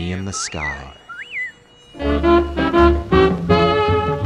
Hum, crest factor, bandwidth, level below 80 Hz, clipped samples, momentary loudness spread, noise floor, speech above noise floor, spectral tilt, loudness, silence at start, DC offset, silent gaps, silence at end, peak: none; 18 dB; 10.5 kHz; -28 dBFS; under 0.1%; 14 LU; -42 dBFS; 23 dB; -5.5 dB/octave; -17 LUFS; 0 s; under 0.1%; none; 0 s; 0 dBFS